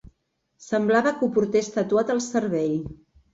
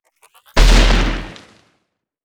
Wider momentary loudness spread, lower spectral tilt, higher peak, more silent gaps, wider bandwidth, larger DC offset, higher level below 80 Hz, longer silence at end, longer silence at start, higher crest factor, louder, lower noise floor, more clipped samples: second, 7 LU vs 15 LU; first, -5.5 dB/octave vs -4 dB/octave; second, -8 dBFS vs 0 dBFS; neither; second, 8 kHz vs 11 kHz; neither; second, -56 dBFS vs -16 dBFS; second, 0.4 s vs 0.9 s; about the same, 0.6 s vs 0.55 s; about the same, 16 dB vs 16 dB; second, -23 LUFS vs -16 LUFS; first, -73 dBFS vs -69 dBFS; neither